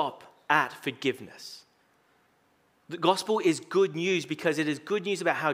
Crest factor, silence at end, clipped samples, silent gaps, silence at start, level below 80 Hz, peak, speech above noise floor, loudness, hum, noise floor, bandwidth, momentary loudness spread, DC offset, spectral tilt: 22 dB; 0 s; under 0.1%; none; 0 s; -82 dBFS; -8 dBFS; 39 dB; -28 LUFS; none; -67 dBFS; 16 kHz; 17 LU; under 0.1%; -4.5 dB/octave